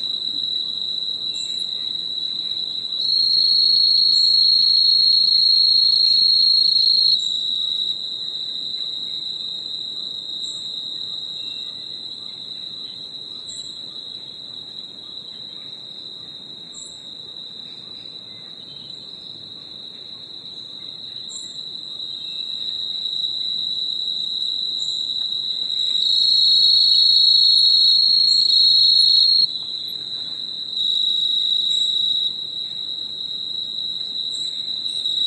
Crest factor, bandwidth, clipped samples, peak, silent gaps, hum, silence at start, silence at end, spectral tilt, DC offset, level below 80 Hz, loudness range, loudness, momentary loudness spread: 16 dB; 12 kHz; under 0.1%; -4 dBFS; none; none; 0 s; 0 s; 0 dB/octave; under 0.1%; -70 dBFS; 20 LU; -16 LUFS; 22 LU